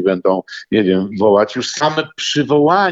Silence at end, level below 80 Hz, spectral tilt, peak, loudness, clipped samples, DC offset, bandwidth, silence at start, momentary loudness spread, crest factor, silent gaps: 0 s; -58 dBFS; -5 dB/octave; -2 dBFS; -15 LUFS; under 0.1%; under 0.1%; 8 kHz; 0 s; 6 LU; 14 dB; none